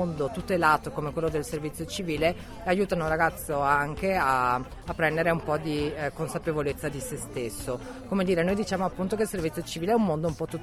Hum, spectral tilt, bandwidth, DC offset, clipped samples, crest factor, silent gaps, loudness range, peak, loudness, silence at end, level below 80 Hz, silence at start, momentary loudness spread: none; -5.5 dB/octave; 15.5 kHz; under 0.1%; under 0.1%; 20 dB; none; 3 LU; -8 dBFS; -28 LUFS; 0 s; -46 dBFS; 0 s; 9 LU